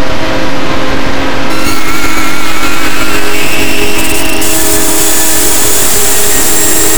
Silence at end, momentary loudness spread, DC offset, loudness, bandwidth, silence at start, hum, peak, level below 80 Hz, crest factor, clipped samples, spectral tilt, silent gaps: 0 s; 7 LU; 60%; -9 LUFS; over 20 kHz; 0 s; none; 0 dBFS; -24 dBFS; 14 dB; 6%; -2 dB/octave; none